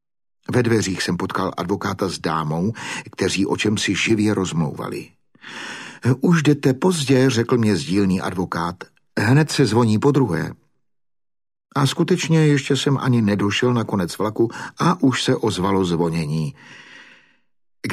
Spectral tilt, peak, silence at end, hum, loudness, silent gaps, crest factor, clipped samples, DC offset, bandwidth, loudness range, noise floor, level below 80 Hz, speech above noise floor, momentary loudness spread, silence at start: -5.5 dB/octave; -4 dBFS; 0 s; none; -20 LUFS; none; 16 dB; under 0.1%; under 0.1%; 14.5 kHz; 3 LU; -73 dBFS; -54 dBFS; 54 dB; 12 LU; 0.5 s